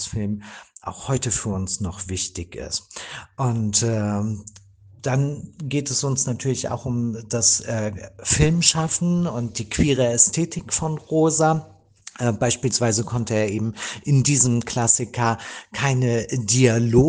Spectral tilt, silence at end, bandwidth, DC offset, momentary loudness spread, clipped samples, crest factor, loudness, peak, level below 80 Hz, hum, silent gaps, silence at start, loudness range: -4 dB/octave; 0 s; 10 kHz; under 0.1%; 12 LU; under 0.1%; 20 dB; -21 LUFS; -2 dBFS; -44 dBFS; none; none; 0 s; 5 LU